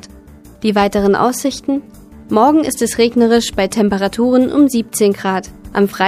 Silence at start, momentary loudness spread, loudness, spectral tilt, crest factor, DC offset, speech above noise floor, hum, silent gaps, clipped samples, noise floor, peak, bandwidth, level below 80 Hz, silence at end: 0.05 s; 9 LU; -14 LUFS; -4.5 dB/octave; 14 dB; under 0.1%; 26 dB; none; none; under 0.1%; -39 dBFS; 0 dBFS; 15.5 kHz; -42 dBFS; 0 s